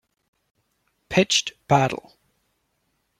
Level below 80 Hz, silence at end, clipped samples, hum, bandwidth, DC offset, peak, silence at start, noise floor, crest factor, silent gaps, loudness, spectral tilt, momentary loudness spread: -58 dBFS; 1.25 s; under 0.1%; none; 15.5 kHz; under 0.1%; -4 dBFS; 1.1 s; -72 dBFS; 22 dB; none; -21 LUFS; -3.5 dB/octave; 7 LU